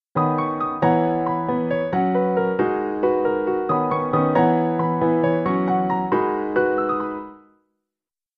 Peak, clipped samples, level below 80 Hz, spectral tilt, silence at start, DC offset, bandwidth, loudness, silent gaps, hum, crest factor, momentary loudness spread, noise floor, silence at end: -6 dBFS; under 0.1%; -56 dBFS; -10.5 dB/octave; 0.15 s; under 0.1%; 5.2 kHz; -21 LUFS; none; none; 16 dB; 4 LU; -89 dBFS; 1 s